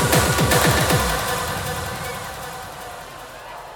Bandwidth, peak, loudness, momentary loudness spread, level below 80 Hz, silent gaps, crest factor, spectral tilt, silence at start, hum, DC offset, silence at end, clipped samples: 17.5 kHz; -2 dBFS; -20 LUFS; 19 LU; -34 dBFS; none; 18 dB; -3.5 dB/octave; 0 s; none; under 0.1%; 0 s; under 0.1%